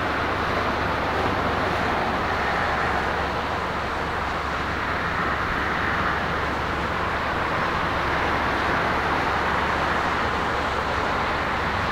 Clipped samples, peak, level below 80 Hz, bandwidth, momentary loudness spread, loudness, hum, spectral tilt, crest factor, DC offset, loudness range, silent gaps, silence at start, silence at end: under 0.1%; -10 dBFS; -38 dBFS; 16 kHz; 3 LU; -24 LUFS; none; -5 dB/octave; 14 dB; under 0.1%; 2 LU; none; 0 s; 0 s